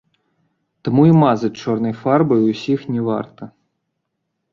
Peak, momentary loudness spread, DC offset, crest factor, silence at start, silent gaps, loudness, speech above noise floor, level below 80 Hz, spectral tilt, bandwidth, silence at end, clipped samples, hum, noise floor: -2 dBFS; 14 LU; under 0.1%; 16 dB; 0.85 s; none; -17 LUFS; 59 dB; -58 dBFS; -8.5 dB/octave; 7.2 kHz; 1.05 s; under 0.1%; none; -75 dBFS